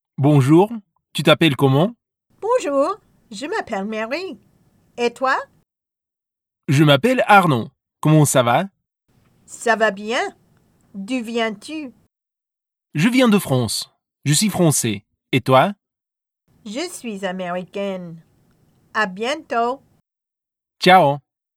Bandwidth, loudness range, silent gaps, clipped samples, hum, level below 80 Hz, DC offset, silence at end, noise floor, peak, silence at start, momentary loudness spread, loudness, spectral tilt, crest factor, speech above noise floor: 16 kHz; 9 LU; none; under 0.1%; none; -62 dBFS; under 0.1%; 0.4 s; -87 dBFS; 0 dBFS; 0.2 s; 18 LU; -18 LUFS; -5 dB/octave; 20 dB; 70 dB